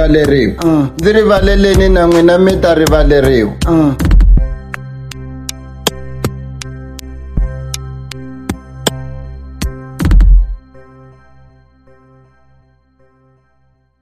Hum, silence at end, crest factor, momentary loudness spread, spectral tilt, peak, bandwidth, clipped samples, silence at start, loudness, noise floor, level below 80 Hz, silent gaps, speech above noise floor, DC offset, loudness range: none; 3.2 s; 12 dB; 18 LU; -6 dB/octave; 0 dBFS; 15.5 kHz; under 0.1%; 0 s; -12 LUFS; -55 dBFS; -16 dBFS; none; 47 dB; under 0.1%; 13 LU